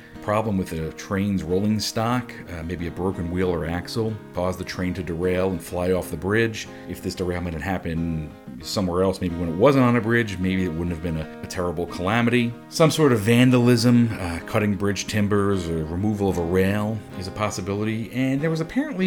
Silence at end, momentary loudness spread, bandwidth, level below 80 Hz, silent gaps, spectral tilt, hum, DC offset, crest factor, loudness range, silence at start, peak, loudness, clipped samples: 0 s; 12 LU; 18 kHz; -44 dBFS; none; -6 dB/octave; none; under 0.1%; 18 dB; 6 LU; 0 s; -4 dBFS; -23 LUFS; under 0.1%